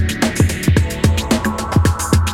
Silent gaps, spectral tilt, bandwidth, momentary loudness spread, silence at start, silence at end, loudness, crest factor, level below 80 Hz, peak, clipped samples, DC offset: none; -5 dB/octave; 16.5 kHz; 2 LU; 0 s; 0 s; -16 LUFS; 14 dB; -28 dBFS; 0 dBFS; under 0.1%; under 0.1%